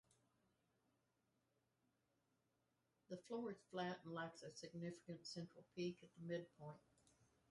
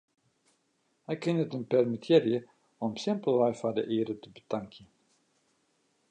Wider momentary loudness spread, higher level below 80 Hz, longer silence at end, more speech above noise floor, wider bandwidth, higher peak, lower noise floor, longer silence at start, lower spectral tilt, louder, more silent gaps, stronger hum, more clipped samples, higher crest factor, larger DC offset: second, 9 LU vs 13 LU; second, -90 dBFS vs -76 dBFS; second, 0.25 s vs 1.25 s; second, 35 dB vs 45 dB; first, 11 kHz vs 9.2 kHz; second, -36 dBFS vs -10 dBFS; first, -87 dBFS vs -75 dBFS; first, 3.1 s vs 1.1 s; second, -5.5 dB/octave vs -7 dB/octave; second, -53 LUFS vs -30 LUFS; neither; neither; neither; about the same, 20 dB vs 20 dB; neither